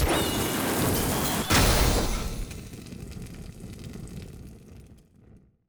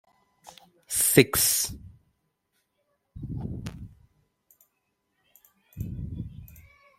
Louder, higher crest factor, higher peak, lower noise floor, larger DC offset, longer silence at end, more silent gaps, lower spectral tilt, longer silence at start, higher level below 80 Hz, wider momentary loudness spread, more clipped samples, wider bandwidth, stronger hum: about the same, -25 LUFS vs -24 LUFS; second, 18 dB vs 28 dB; second, -10 dBFS vs -2 dBFS; second, -55 dBFS vs -77 dBFS; neither; about the same, 0.3 s vs 0.4 s; neither; about the same, -4 dB/octave vs -3 dB/octave; second, 0 s vs 0.45 s; first, -34 dBFS vs -50 dBFS; second, 21 LU vs 25 LU; neither; first, over 20 kHz vs 16.5 kHz; neither